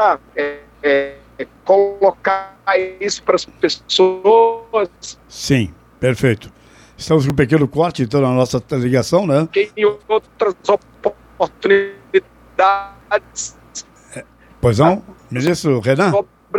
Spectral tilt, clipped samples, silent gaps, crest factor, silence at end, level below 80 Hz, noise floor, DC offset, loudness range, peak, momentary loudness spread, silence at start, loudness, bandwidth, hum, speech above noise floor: -5.5 dB/octave; under 0.1%; none; 16 dB; 0 s; -46 dBFS; -36 dBFS; under 0.1%; 3 LU; -2 dBFS; 13 LU; 0 s; -17 LUFS; 14.5 kHz; none; 21 dB